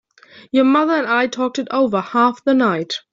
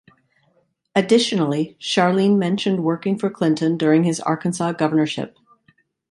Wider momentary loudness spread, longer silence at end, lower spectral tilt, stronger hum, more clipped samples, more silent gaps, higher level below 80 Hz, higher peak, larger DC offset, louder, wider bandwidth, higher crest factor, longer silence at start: about the same, 6 LU vs 6 LU; second, 0.15 s vs 0.85 s; about the same, -5 dB/octave vs -5.5 dB/octave; neither; neither; neither; about the same, -64 dBFS vs -66 dBFS; about the same, -4 dBFS vs -2 dBFS; neither; about the same, -17 LUFS vs -19 LUFS; second, 7.6 kHz vs 11.5 kHz; about the same, 14 dB vs 18 dB; second, 0.35 s vs 0.95 s